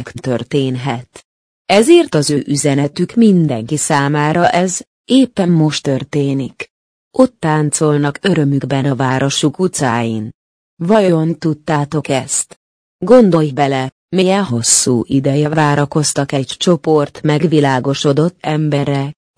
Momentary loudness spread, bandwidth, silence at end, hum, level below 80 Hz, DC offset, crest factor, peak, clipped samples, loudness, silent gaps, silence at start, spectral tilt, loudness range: 10 LU; 10.5 kHz; 0.25 s; none; -52 dBFS; under 0.1%; 14 dB; 0 dBFS; under 0.1%; -14 LUFS; 1.24-1.65 s, 4.87-5.04 s, 6.70-7.11 s, 10.34-10.77 s, 12.56-12.99 s, 13.92-14.08 s; 0 s; -5 dB/octave; 3 LU